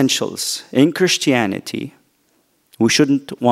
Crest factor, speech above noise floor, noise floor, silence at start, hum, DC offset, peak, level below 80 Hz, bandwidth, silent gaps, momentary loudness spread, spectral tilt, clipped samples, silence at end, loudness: 18 dB; 45 dB; -61 dBFS; 0 s; none; under 0.1%; 0 dBFS; -60 dBFS; 16 kHz; none; 12 LU; -4 dB/octave; under 0.1%; 0 s; -17 LUFS